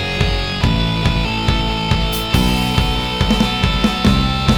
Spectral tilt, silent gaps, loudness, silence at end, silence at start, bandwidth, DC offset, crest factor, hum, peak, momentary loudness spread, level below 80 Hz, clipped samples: -5.5 dB/octave; none; -16 LUFS; 0 s; 0 s; 19.5 kHz; 0.7%; 16 dB; none; 0 dBFS; 3 LU; -22 dBFS; under 0.1%